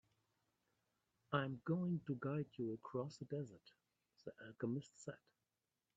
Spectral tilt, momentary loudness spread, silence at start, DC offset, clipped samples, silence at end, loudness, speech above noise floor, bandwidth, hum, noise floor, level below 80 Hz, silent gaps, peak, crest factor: -7.5 dB/octave; 14 LU; 1.3 s; under 0.1%; under 0.1%; 0.8 s; -45 LUFS; over 45 dB; 8 kHz; none; under -90 dBFS; -82 dBFS; none; -22 dBFS; 24 dB